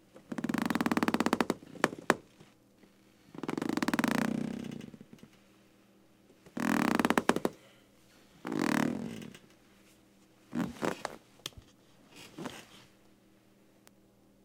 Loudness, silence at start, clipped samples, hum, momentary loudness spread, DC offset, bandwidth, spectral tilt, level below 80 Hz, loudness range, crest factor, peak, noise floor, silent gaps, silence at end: -33 LUFS; 0.15 s; under 0.1%; none; 21 LU; under 0.1%; 18 kHz; -5 dB/octave; -68 dBFS; 9 LU; 30 dB; -6 dBFS; -64 dBFS; none; 1.65 s